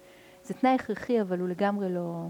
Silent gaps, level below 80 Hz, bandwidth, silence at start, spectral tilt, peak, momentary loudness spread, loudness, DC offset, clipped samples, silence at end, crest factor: none; -68 dBFS; 18.5 kHz; 0.45 s; -7.5 dB/octave; -14 dBFS; 5 LU; -28 LUFS; under 0.1%; under 0.1%; 0 s; 16 dB